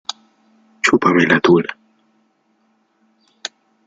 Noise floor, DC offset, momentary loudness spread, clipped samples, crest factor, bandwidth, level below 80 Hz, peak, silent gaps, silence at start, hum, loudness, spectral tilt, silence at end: -62 dBFS; under 0.1%; 19 LU; under 0.1%; 20 dB; 9.2 kHz; -60 dBFS; 0 dBFS; none; 0.85 s; none; -14 LUFS; -5 dB/octave; 2.15 s